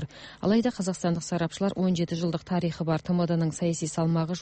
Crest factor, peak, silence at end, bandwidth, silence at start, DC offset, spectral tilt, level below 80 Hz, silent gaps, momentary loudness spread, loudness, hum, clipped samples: 14 dB; -12 dBFS; 0 s; 8.8 kHz; 0 s; under 0.1%; -6.5 dB/octave; -58 dBFS; none; 4 LU; -27 LUFS; none; under 0.1%